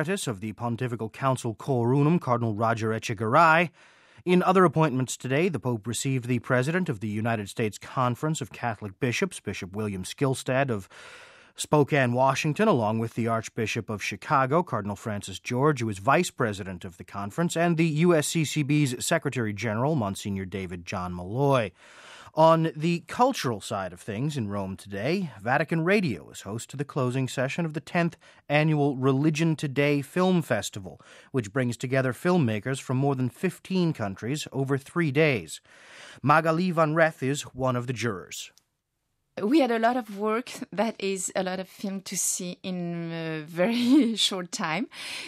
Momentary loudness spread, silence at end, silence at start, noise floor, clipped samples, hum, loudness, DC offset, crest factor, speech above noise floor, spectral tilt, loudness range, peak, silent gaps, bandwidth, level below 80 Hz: 12 LU; 0 s; 0 s; -78 dBFS; under 0.1%; none; -26 LUFS; under 0.1%; 20 dB; 52 dB; -5.5 dB/octave; 4 LU; -6 dBFS; none; 15.5 kHz; -66 dBFS